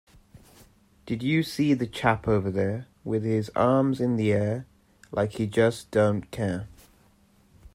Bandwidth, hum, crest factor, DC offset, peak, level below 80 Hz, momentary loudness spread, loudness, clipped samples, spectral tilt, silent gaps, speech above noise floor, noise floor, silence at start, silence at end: 15.5 kHz; none; 18 dB; under 0.1%; -8 dBFS; -54 dBFS; 9 LU; -26 LUFS; under 0.1%; -7 dB/octave; none; 35 dB; -60 dBFS; 0.35 s; 1.05 s